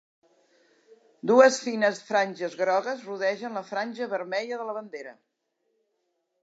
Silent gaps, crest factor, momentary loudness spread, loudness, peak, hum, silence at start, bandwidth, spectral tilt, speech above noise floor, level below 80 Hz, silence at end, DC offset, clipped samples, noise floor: none; 24 dB; 16 LU; -26 LUFS; -4 dBFS; none; 1.25 s; 8 kHz; -3.5 dB/octave; 51 dB; -88 dBFS; 1.3 s; under 0.1%; under 0.1%; -77 dBFS